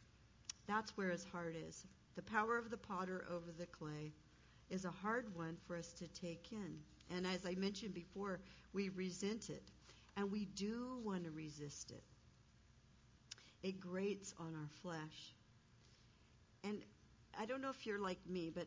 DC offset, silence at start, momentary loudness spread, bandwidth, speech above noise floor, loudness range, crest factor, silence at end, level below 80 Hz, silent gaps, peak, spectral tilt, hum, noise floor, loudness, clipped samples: under 0.1%; 0 s; 12 LU; 7.6 kHz; 23 dB; 5 LU; 22 dB; 0 s; -72 dBFS; none; -26 dBFS; -5 dB/octave; none; -70 dBFS; -47 LUFS; under 0.1%